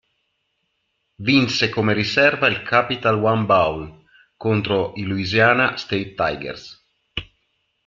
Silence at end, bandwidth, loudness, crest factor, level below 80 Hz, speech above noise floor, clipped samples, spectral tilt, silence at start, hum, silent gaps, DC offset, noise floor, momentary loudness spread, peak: 0.6 s; 7.6 kHz; -19 LUFS; 20 dB; -52 dBFS; 53 dB; under 0.1%; -5.5 dB/octave; 1.2 s; none; none; under 0.1%; -72 dBFS; 16 LU; -2 dBFS